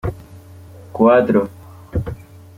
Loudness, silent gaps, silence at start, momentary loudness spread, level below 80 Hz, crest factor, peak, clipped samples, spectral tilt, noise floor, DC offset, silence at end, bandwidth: -17 LUFS; none; 0.05 s; 22 LU; -40 dBFS; 18 dB; 0 dBFS; under 0.1%; -9 dB/octave; -40 dBFS; under 0.1%; 0.4 s; 15.5 kHz